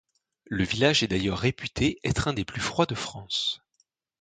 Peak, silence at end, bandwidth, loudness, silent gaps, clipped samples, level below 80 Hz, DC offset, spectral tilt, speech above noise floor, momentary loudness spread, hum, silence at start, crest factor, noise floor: -6 dBFS; 0.65 s; 9.6 kHz; -27 LUFS; none; under 0.1%; -46 dBFS; under 0.1%; -4.5 dB/octave; 45 dB; 8 LU; none; 0.5 s; 22 dB; -71 dBFS